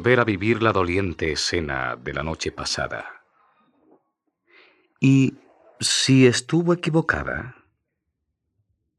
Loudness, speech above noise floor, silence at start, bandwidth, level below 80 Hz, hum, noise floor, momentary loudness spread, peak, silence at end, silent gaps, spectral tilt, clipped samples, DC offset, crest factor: -21 LUFS; 57 dB; 0 s; 12.5 kHz; -48 dBFS; none; -78 dBFS; 12 LU; -2 dBFS; 1.45 s; none; -4.5 dB/octave; under 0.1%; under 0.1%; 22 dB